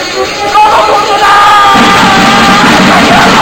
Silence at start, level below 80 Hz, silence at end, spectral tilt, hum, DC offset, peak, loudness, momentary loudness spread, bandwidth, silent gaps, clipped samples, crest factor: 0 s; -30 dBFS; 0 s; -3.5 dB/octave; none; under 0.1%; 0 dBFS; -4 LUFS; 4 LU; over 20 kHz; none; 7%; 4 dB